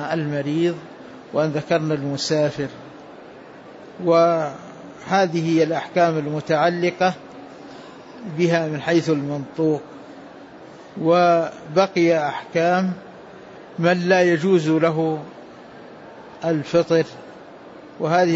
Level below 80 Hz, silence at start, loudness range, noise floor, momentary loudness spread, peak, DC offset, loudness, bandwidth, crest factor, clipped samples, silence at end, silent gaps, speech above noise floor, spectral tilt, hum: -64 dBFS; 0 s; 4 LU; -41 dBFS; 24 LU; -4 dBFS; under 0.1%; -20 LUFS; 8 kHz; 18 dB; under 0.1%; 0 s; none; 22 dB; -6 dB/octave; none